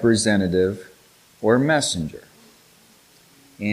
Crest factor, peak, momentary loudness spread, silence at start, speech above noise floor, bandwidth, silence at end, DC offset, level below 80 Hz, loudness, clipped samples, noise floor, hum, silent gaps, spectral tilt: 18 dB; -4 dBFS; 15 LU; 0 s; 34 dB; 15.5 kHz; 0 s; under 0.1%; -52 dBFS; -21 LUFS; under 0.1%; -54 dBFS; none; none; -4.5 dB/octave